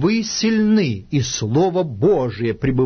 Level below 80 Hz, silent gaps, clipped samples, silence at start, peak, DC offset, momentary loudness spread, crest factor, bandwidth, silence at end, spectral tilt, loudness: -42 dBFS; none; under 0.1%; 0 s; -6 dBFS; under 0.1%; 5 LU; 12 dB; 6.6 kHz; 0 s; -5.5 dB/octave; -18 LUFS